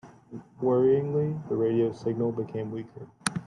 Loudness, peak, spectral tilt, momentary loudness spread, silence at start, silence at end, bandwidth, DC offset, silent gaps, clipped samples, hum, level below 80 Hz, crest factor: -27 LUFS; -4 dBFS; -6.5 dB/octave; 21 LU; 0.05 s; 0 s; 12 kHz; under 0.1%; none; under 0.1%; none; -66 dBFS; 24 dB